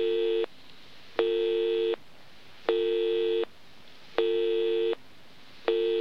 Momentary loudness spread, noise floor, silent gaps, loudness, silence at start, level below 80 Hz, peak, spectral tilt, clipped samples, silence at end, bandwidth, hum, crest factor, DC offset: 9 LU; -55 dBFS; none; -29 LUFS; 0 s; -72 dBFS; -10 dBFS; -5 dB/octave; under 0.1%; 0 s; 6.2 kHz; none; 20 dB; 0.5%